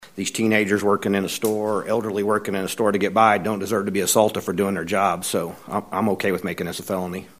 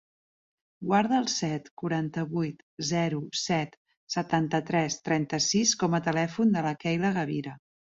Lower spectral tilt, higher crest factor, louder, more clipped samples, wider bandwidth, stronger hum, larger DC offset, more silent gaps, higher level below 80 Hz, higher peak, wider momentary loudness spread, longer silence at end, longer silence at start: about the same, -4.5 dB/octave vs -4.5 dB/octave; about the same, 20 dB vs 18 dB; first, -22 LUFS vs -28 LUFS; neither; first, 16 kHz vs 8 kHz; neither; first, 0.1% vs under 0.1%; second, none vs 1.71-1.77 s, 2.63-2.77 s, 3.77-3.85 s, 3.97-4.07 s; first, -60 dBFS vs -66 dBFS; first, -2 dBFS vs -10 dBFS; about the same, 9 LU vs 10 LU; second, 0.1 s vs 0.4 s; second, 0 s vs 0.8 s